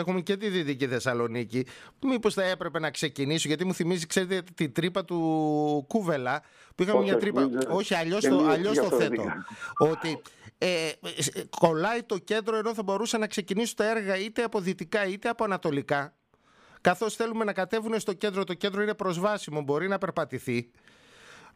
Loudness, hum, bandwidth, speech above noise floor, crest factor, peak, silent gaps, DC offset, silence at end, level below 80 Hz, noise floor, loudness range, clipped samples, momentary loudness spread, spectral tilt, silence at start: -28 LUFS; none; 15.5 kHz; 34 dB; 22 dB; -6 dBFS; none; under 0.1%; 0.1 s; -68 dBFS; -62 dBFS; 4 LU; under 0.1%; 7 LU; -5 dB/octave; 0 s